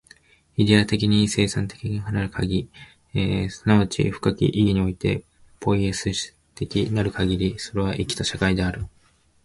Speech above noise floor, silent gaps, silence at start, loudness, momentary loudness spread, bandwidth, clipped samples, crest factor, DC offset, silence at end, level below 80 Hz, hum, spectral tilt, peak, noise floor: 37 dB; none; 0.6 s; -23 LUFS; 10 LU; 11.5 kHz; under 0.1%; 22 dB; under 0.1%; 0.55 s; -40 dBFS; none; -5.5 dB/octave; -2 dBFS; -59 dBFS